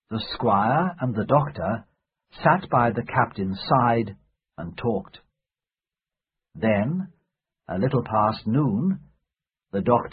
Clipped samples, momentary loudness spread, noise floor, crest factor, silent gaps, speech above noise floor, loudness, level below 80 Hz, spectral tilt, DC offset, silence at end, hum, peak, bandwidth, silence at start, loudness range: under 0.1%; 11 LU; under -90 dBFS; 22 dB; none; over 67 dB; -24 LUFS; -52 dBFS; -11.5 dB/octave; under 0.1%; 0 s; none; -4 dBFS; 5 kHz; 0.1 s; 7 LU